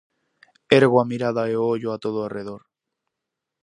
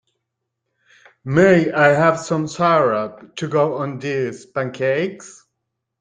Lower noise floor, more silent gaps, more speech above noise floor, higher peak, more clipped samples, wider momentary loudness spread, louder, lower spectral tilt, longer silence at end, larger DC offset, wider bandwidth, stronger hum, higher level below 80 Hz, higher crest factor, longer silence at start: first, -84 dBFS vs -78 dBFS; neither; about the same, 63 dB vs 60 dB; about the same, 0 dBFS vs 0 dBFS; neither; first, 17 LU vs 13 LU; second, -21 LUFS vs -18 LUFS; about the same, -6.5 dB/octave vs -6 dB/octave; first, 1.05 s vs 0.7 s; neither; about the same, 10.5 kHz vs 9.6 kHz; neither; second, -66 dBFS vs -58 dBFS; about the same, 22 dB vs 18 dB; second, 0.7 s vs 1.25 s